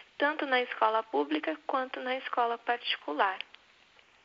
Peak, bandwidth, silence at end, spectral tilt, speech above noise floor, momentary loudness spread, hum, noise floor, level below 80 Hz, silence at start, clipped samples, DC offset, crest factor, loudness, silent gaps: -10 dBFS; 7.4 kHz; 0.8 s; 2 dB/octave; 31 dB; 6 LU; none; -62 dBFS; -84 dBFS; 0.2 s; under 0.1%; under 0.1%; 22 dB; -31 LUFS; none